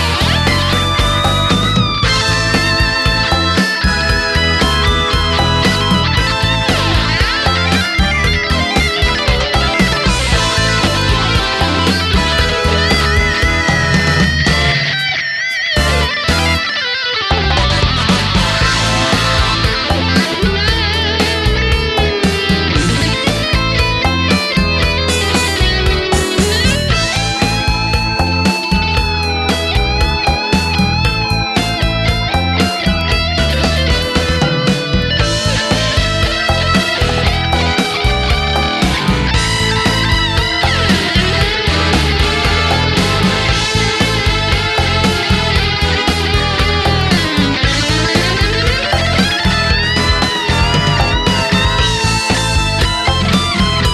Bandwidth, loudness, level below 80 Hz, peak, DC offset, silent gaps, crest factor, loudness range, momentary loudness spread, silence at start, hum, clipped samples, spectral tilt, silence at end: 14 kHz; -13 LUFS; -20 dBFS; 0 dBFS; under 0.1%; none; 14 dB; 1 LU; 2 LU; 0 s; none; under 0.1%; -4 dB/octave; 0 s